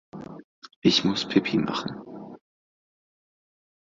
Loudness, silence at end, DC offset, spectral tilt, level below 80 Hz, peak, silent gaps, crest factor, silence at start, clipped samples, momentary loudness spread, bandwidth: -24 LUFS; 1.5 s; under 0.1%; -5 dB/octave; -64 dBFS; -6 dBFS; 0.44-0.62 s, 0.76-0.82 s; 22 dB; 0.15 s; under 0.1%; 22 LU; 7.8 kHz